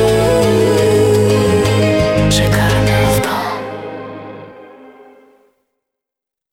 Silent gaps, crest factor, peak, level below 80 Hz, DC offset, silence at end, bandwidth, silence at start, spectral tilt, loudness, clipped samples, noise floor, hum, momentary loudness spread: none; 14 dB; 0 dBFS; -32 dBFS; under 0.1%; 1.85 s; 17 kHz; 0 s; -5.5 dB/octave; -13 LUFS; under 0.1%; -84 dBFS; none; 17 LU